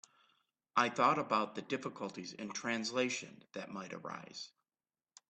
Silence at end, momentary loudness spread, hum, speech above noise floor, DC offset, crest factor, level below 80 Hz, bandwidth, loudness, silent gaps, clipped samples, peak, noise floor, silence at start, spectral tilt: 0.8 s; 17 LU; none; over 53 dB; under 0.1%; 24 dB; -82 dBFS; 8.8 kHz; -37 LUFS; none; under 0.1%; -14 dBFS; under -90 dBFS; 0.75 s; -3.5 dB/octave